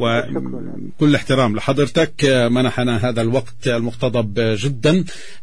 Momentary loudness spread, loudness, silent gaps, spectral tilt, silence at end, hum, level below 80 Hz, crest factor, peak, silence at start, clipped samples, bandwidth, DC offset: 10 LU; -18 LUFS; none; -6 dB/octave; 0.1 s; none; -46 dBFS; 14 dB; -4 dBFS; 0 s; under 0.1%; 10.5 kHz; 4%